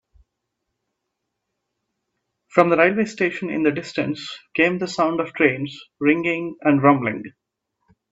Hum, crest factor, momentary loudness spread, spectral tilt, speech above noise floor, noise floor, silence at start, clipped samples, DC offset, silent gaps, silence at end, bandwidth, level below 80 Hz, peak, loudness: none; 22 dB; 12 LU; -6.5 dB/octave; 59 dB; -79 dBFS; 2.55 s; under 0.1%; under 0.1%; none; 0.8 s; 8 kHz; -64 dBFS; 0 dBFS; -20 LUFS